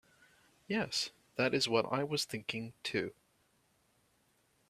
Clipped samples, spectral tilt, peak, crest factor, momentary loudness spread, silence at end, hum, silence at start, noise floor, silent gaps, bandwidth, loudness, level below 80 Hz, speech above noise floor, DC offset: under 0.1%; -3.5 dB/octave; -16 dBFS; 22 dB; 9 LU; 1.6 s; none; 0.7 s; -74 dBFS; none; 15 kHz; -35 LUFS; -74 dBFS; 38 dB; under 0.1%